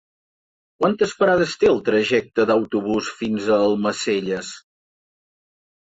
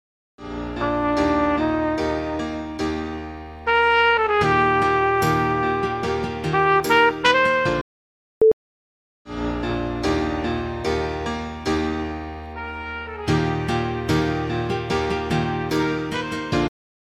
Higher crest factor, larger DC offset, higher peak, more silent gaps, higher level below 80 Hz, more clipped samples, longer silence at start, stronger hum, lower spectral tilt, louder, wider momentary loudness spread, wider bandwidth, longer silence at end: second, 16 dB vs 22 dB; neither; second, -6 dBFS vs 0 dBFS; second, none vs 7.81-8.41 s, 8.53-9.25 s; second, -56 dBFS vs -40 dBFS; neither; first, 0.8 s vs 0.4 s; neither; about the same, -5 dB/octave vs -5.5 dB/octave; about the same, -20 LUFS vs -21 LUFS; second, 8 LU vs 13 LU; second, 8 kHz vs 15 kHz; first, 1.35 s vs 0.45 s